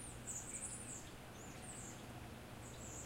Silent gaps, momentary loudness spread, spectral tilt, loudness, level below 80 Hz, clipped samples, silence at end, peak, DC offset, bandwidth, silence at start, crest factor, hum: none; 8 LU; -3 dB/octave; -49 LUFS; -62 dBFS; under 0.1%; 0 s; -34 dBFS; under 0.1%; 16 kHz; 0 s; 16 dB; none